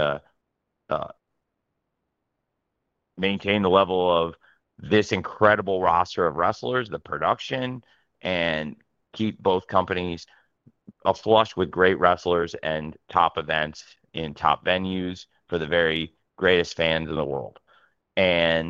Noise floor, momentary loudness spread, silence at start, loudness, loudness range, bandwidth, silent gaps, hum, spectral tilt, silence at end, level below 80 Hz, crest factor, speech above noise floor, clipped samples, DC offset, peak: -79 dBFS; 13 LU; 0 s; -24 LUFS; 5 LU; 7.6 kHz; none; none; -5.5 dB/octave; 0 s; -54 dBFS; 22 dB; 56 dB; under 0.1%; under 0.1%; -2 dBFS